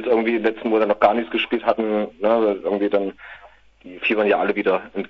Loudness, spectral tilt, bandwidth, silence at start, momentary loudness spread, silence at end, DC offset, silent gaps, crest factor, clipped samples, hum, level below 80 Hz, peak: -20 LUFS; -7.5 dB/octave; 6 kHz; 0 s; 6 LU; 0.05 s; under 0.1%; none; 18 dB; under 0.1%; none; -58 dBFS; -2 dBFS